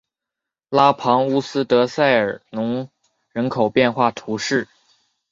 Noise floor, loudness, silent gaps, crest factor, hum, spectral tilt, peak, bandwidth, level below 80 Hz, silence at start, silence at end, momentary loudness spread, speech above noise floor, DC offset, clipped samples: -85 dBFS; -19 LUFS; none; 18 dB; none; -5.5 dB/octave; -2 dBFS; 7.8 kHz; -62 dBFS; 0.7 s; 0.65 s; 10 LU; 67 dB; under 0.1%; under 0.1%